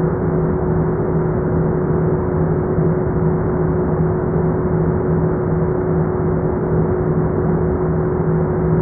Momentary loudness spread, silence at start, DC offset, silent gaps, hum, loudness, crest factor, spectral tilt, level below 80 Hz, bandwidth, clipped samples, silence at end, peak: 1 LU; 0 s; under 0.1%; none; none; -18 LUFS; 12 dB; -14.5 dB/octave; -30 dBFS; 2.4 kHz; under 0.1%; 0 s; -6 dBFS